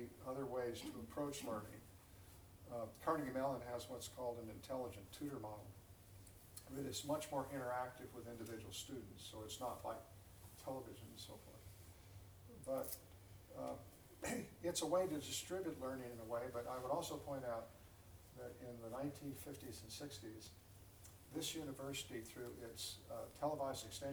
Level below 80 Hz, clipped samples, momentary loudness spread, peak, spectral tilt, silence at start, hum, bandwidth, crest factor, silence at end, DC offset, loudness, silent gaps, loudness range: -70 dBFS; under 0.1%; 17 LU; -26 dBFS; -4 dB/octave; 0 s; none; over 20 kHz; 22 dB; 0 s; under 0.1%; -47 LUFS; none; 7 LU